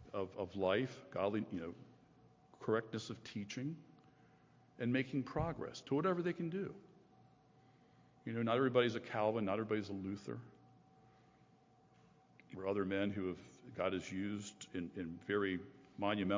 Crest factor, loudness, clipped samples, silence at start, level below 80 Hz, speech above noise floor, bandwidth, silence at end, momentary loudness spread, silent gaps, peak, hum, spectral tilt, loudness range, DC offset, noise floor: 22 dB; -40 LUFS; under 0.1%; 0 s; -68 dBFS; 29 dB; 7.6 kHz; 0 s; 12 LU; none; -18 dBFS; none; -6.5 dB/octave; 6 LU; under 0.1%; -69 dBFS